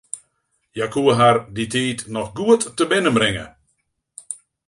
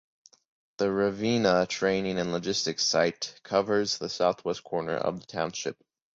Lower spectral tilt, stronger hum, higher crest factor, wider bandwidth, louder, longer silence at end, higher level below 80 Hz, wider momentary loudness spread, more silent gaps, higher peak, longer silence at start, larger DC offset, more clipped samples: about the same, -4.5 dB/octave vs -4 dB/octave; neither; about the same, 18 dB vs 20 dB; first, 11.5 kHz vs 7.8 kHz; first, -19 LUFS vs -28 LUFS; about the same, 0.35 s vs 0.45 s; first, -52 dBFS vs -62 dBFS; first, 19 LU vs 8 LU; neither; first, -2 dBFS vs -10 dBFS; second, 0.15 s vs 0.8 s; neither; neither